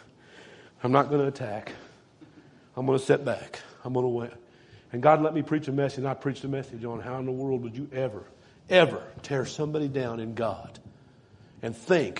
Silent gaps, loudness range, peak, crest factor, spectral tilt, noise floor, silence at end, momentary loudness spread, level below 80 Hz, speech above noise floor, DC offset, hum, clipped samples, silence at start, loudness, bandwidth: none; 4 LU; -4 dBFS; 24 dB; -6.5 dB/octave; -55 dBFS; 0 s; 17 LU; -66 dBFS; 28 dB; under 0.1%; none; under 0.1%; 0.35 s; -28 LUFS; 10.5 kHz